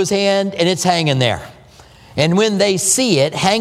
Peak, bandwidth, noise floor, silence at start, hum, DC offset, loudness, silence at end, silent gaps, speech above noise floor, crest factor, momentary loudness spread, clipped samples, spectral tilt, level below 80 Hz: 0 dBFS; 16 kHz; -43 dBFS; 0 s; none; under 0.1%; -15 LUFS; 0 s; none; 28 dB; 16 dB; 5 LU; under 0.1%; -4 dB/octave; -50 dBFS